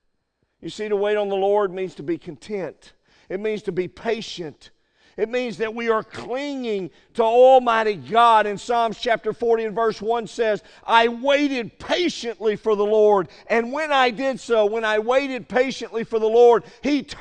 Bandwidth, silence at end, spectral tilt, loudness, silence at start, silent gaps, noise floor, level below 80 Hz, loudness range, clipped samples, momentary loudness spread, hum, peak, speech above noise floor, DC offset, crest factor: 9.4 kHz; 0 s; -4.5 dB/octave; -21 LUFS; 0.65 s; none; -71 dBFS; -58 dBFS; 9 LU; under 0.1%; 14 LU; none; 0 dBFS; 51 dB; under 0.1%; 20 dB